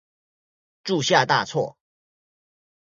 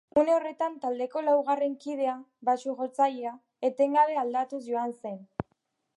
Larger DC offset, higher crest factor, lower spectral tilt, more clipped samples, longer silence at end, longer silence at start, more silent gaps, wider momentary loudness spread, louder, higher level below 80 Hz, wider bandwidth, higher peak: neither; first, 24 dB vs 18 dB; second, -3.5 dB/octave vs -6 dB/octave; neither; first, 1.15 s vs 0.55 s; first, 0.85 s vs 0.15 s; neither; about the same, 13 LU vs 14 LU; first, -22 LUFS vs -28 LUFS; about the same, -68 dBFS vs -66 dBFS; second, 7.6 kHz vs 11.5 kHz; first, -2 dBFS vs -10 dBFS